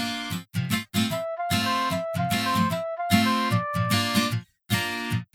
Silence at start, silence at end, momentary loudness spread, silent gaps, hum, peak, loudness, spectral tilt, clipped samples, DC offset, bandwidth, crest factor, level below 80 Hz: 0 s; 0.1 s; 7 LU; none; none; -6 dBFS; -25 LUFS; -4.5 dB/octave; under 0.1%; under 0.1%; 18.5 kHz; 20 dB; -58 dBFS